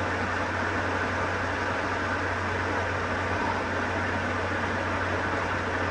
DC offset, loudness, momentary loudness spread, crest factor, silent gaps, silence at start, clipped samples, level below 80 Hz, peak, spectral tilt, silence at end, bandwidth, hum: under 0.1%; -28 LUFS; 1 LU; 14 dB; none; 0 s; under 0.1%; -48 dBFS; -14 dBFS; -5.5 dB/octave; 0 s; 11 kHz; none